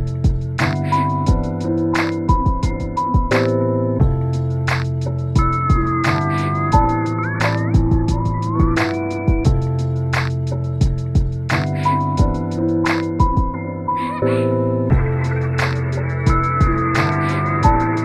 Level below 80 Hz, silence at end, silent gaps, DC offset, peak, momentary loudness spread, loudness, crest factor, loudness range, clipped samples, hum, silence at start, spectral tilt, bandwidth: -24 dBFS; 0 s; none; under 0.1%; 0 dBFS; 4 LU; -18 LUFS; 16 dB; 1 LU; under 0.1%; none; 0 s; -7.5 dB/octave; 11.5 kHz